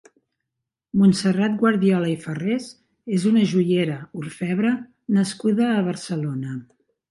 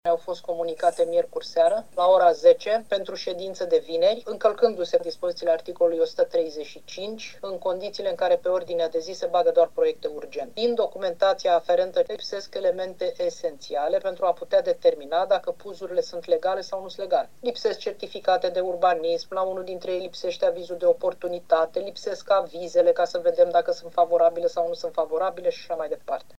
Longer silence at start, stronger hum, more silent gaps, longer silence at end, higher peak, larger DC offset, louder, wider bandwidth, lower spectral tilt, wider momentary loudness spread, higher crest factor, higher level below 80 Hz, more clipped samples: first, 0.95 s vs 0 s; neither; neither; first, 0.45 s vs 0.2 s; about the same, -6 dBFS vs -6 dBFS; second, under 0.1% vs 0.5%; about the same, -22 LUFS vs -24 LUFS; first, 11.5 kHz vs 10 kHz; first, -6.5 dB/octave vs -4 dB/octave; about the same, 12 LU vs 11 LU; about the same, 16 dB vs 18 dB; first, -64 dBFS vs -70 dBFS; neither